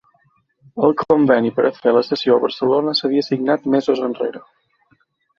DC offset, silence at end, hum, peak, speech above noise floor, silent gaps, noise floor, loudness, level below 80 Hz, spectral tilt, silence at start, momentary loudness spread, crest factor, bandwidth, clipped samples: under 0.1%; 1 s; none; -2 dBFS; 44 dB; none; -61 dBFS; -17 LUFS; -62 dBFS; -7 dB/octave; 0.75 s; 6 LU; 16 dB; 7 kHz; under 0.1%